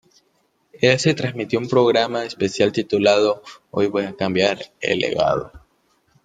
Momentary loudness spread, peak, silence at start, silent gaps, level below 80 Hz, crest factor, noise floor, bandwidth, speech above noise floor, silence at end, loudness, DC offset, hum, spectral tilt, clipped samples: 8 LU; -2 dBFS; 0.8 s; none; -56 dBFS; 18 dB; -65 dBFS; 9.4 kHz; 46 dB; 0.65 s; -20 LUFS; under 0.1%; none; -5 dB/octave; under 0.1%